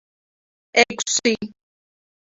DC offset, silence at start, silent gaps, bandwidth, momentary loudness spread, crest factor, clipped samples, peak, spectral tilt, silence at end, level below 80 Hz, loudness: under 0.1%; 0.75 s; none; 8 kHz; 10 LU; 24 dB; under 0.1%; 0 dBFS; -1.5 dB/octave; 0.8 s; -66 dBFS; -20 LUFS